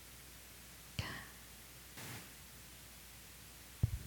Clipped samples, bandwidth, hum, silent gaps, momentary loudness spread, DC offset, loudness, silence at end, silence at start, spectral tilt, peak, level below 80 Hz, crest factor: under 0.1%; 18 kHz; none; none; 10 LU; under 0.1%; -49 LUFS; 0 s; 0 s; -4 dB/octave; -20 dBFS; -56 dBFS; 26 dB